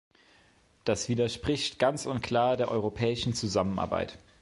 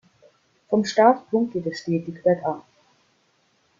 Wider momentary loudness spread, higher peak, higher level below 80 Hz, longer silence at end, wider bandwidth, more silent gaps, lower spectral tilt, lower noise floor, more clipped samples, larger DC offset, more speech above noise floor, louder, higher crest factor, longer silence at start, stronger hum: second, 6 LU vs 11 LU; second, -10 dBFS vs -4 dBFS; first, -52 dBFS vs -68 dBFS; second, 0.25 s vs 1.2 s; first, 11.5 kHz vs 7.6 kHz; neither; about the same, -5 dB/octave vs -6 dB/octave; about the same, -63 dBFS vs -65 dBFS; neither; neither; second, 34 dB vs 44 dB; second, -29 LUFS vs -22 LUFS; about the same, 20 dB vs 20 dB; first, 0.85 s vs 0.7 s; neither